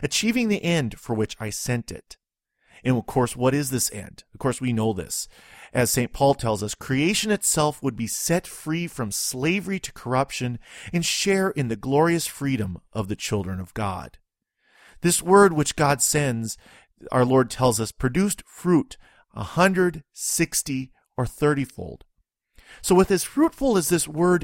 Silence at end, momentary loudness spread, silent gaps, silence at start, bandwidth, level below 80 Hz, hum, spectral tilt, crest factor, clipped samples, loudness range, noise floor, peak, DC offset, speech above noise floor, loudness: 0 s; 11 LU; none; 0 s; 16.5 kHz; -48 dBFS; none; -4.5 dB/octave; 22 dB; under 0.1%; 4 LU; -70 dBFS; -2 dBFS; under 0.1%; 47 dB; -23 LUFS